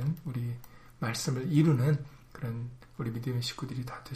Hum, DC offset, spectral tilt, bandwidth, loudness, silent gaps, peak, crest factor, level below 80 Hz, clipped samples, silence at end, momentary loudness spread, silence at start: none; under 0.1%; -6 dB/octave; 15.5 kHz; -32 LUFS; none; -14 dBFS; 18 dB; -58 dBFS; under 0.1%; 0 s; 15 LU; 0 s